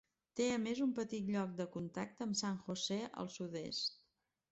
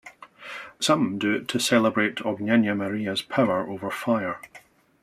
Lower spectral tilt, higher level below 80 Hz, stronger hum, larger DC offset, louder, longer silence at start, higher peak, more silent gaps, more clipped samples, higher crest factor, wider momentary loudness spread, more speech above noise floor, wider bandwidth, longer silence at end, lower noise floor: about the same, -4.5 dB/octave vs -4.5 dB/octave; second, -76 dBFS vs -68 dBFS; neither; neither; second, -41 LUFS vs -24 LUFS; first, 0.35 s vs 0.05 s; second, -24 dBFS vs -6 dBFS; neither; neither; about the same, 16 dB vs 20 dB; second, 8 LU vs 16 LU; first, 42 dB vs 28 dB; second, 8.2 kHz vs 14.5 kHz; first, 0.6 s vs 0.45 s; first, -82 dBFS vs -52 dBFS